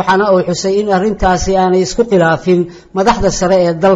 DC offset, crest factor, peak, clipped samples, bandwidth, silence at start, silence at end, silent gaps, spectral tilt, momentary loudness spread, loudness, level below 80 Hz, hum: under 0.1%; 12 dB; 0 dBFS; under 0.1%; 7.8 kHz; 0 s; 0 s; none; -5.5 dB/octave; 4 LU; -12 LUFS; -30 dBFS; none